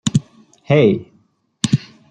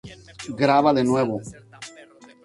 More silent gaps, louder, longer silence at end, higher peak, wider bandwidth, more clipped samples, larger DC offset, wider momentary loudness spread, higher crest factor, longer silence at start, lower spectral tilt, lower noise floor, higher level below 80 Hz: neither; about the same, -18 LUFS vs -20 LUFS; second, 0.3 s vs 0.55 s; first, 0 dBFS vs -4 dBFS; second, 9.8 kHz vs 11.5 kHz; neither; neither; second, 10 LU vs 23 LU; about the same, 18 dB vs 20 dB; about the same, 0.05 s vs 0.05 s; about the same, -6 dB/octave vs -6 dB/octave; first, -58 dBFS vs -48 dBFS; about the same, -52 dBFS vs -56 dBFS